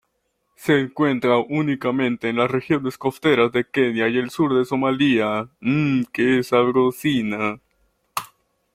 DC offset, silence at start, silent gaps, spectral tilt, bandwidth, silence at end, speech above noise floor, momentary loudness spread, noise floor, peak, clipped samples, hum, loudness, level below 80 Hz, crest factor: under 0.1%; 0.6 s; none; -6.5 dB/octave; 16 kHz; 0.5 s; 52 dB; 7 LU; -72 dBFS; -4 dBFS; under 0.1%; none; -20 LUFS; -60 dBFS; 16 dB